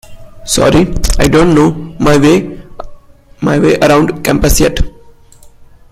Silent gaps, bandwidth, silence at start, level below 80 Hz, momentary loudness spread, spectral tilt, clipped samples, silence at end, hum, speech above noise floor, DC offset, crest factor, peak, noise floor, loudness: none; 16 kHz; 0.1 s; -20 dBFS; 14 LU; -5 dB/octave; under 0.1%; 0.25 s; none; 30 dB; under 0.1%; 10 dB; 0 dBFS; -38 dBFS; -10 LUFS